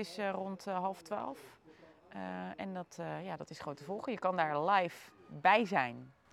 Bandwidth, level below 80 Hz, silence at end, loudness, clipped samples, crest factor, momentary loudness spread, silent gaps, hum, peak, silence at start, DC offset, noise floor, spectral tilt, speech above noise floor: 14.5 kHz; -80 dBFS; 0.2 s; -36 LUFS; under 0.1%; 22 dB; 16 LU; none; none; -14 dBFS; 0 s; under 0.1%; -60 dBFS; -5.5 dB/octave; 24 dB